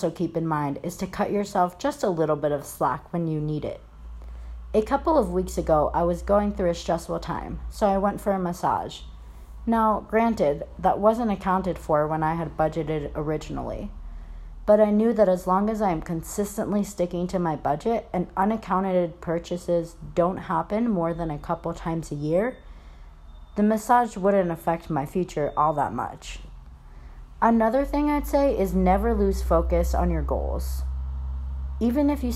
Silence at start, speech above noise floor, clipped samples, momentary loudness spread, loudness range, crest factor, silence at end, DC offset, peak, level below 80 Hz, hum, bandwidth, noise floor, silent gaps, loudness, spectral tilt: 0 s; 20 dB; under 0.1%; 11 LU; 4 LU; 18 dB; 0 s; under 0.1%; -6 dBFS; -36 dBFS; none; 15 kHz; -44 dBFS; none; -25 LUFS; -7 dB/octave